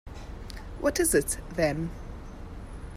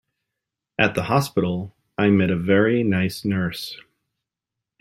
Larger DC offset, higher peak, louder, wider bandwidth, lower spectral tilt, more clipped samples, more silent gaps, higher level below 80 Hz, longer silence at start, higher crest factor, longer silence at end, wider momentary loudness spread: neither; second, -12 dBFS vs -2 dBFS; second, -27 LUFS vs -21 LUFS; first, 16 kHz vs 14.5 kHz; second, -4 dB/octave vs -6.5 dB/octave; neither; neither; first, -42 dBFS vs -56 dBFS; second, 0.05 s vs 0.8 s; about the same, 18 dB vs 20 dB; second, 0 s vs 1.05 s; first, 19 LU vs 15 LU